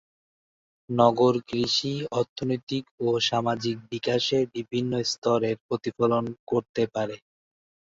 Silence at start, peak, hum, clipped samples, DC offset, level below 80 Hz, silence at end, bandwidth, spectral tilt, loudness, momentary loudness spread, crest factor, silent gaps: 0.9 s; -4 dBFS; none; under 0.1%; under 0.1%; -64 dBFS; 0.8 s; 8 kHz; -5 dB/octave; -26 LUFS; 8 LU; 22 dB; 2.29-2.36 s, 2.63-2.67 s, 2.91-2.98 s, 5.18-5.22 s, 5.61-5.69 s, 6.39-6.47 s, 6.69-6.74 s